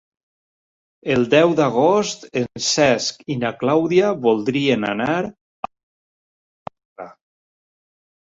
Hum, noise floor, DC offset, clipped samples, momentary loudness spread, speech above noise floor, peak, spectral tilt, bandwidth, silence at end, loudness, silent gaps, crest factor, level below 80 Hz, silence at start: none; under -90 dBFS; under 0.1%; under 0.1%; 23 LU; over 72 dB; -2 dBFS; -4.5 dB/octave; 8 kHz; 1.15 s; -18 LUFS; 5.41-5.63 s, 5.83-6.66 s, 6.85-6.96 s; 18 dB; -60 dBFS; 1.05 s